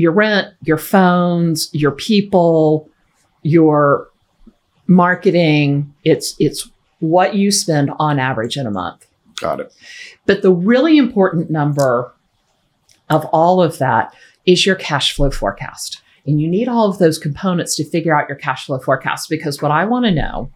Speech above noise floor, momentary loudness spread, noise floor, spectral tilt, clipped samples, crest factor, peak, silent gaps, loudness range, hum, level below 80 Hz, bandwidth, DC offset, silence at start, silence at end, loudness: 48 dB; 12 LU; -62 dBFS; -5.5 dB/octave; under 0.1%; 16 dB; 0 dBFS; none; 3 LU; none; -36 dBFS; 17 kHz; under 0.1%; 0 s; 0.05 s; -15 LUFS